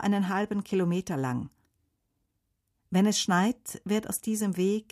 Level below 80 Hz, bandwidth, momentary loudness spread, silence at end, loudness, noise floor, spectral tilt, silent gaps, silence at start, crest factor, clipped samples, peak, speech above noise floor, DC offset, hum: -66 dBFS; 15.5 kHz; 7 LU; 0.1 s; -28 LUFS; -78 dBFS; -5 dB/octave; none; 0 s; 14 dB; under 0.1%; -14 dBFS; 50 dB; under 0.1%; none